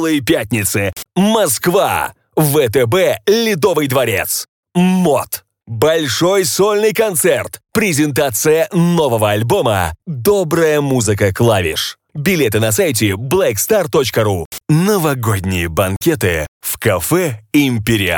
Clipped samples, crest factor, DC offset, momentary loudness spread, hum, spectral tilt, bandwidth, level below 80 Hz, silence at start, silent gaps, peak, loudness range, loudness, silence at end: under 0.1%; 14 dB; under 0.1%; 6 LU; none; -4.5 dB/octave; 19 kHz; -42 dBFS; 0 s; 4.48-4.63 s, 14.45-14.51 s, 16.48-16.60 s; 0 dBFS; 1 LU; -14 LUFS; 0 s